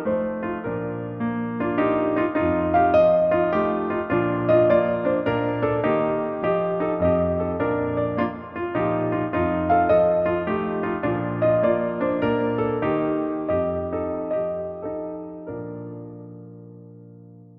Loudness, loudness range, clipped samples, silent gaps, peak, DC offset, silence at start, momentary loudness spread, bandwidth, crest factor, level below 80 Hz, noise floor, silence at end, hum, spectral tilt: -23 LUFS; 7 LU; under 0.1%; none; -8 dBFS; under 0.1%; 0 s; 13 LU; 5.2 kHz; 16 dB; -50 dBFS; -45 dBFS; 0.15 s; none; -10 dB/octave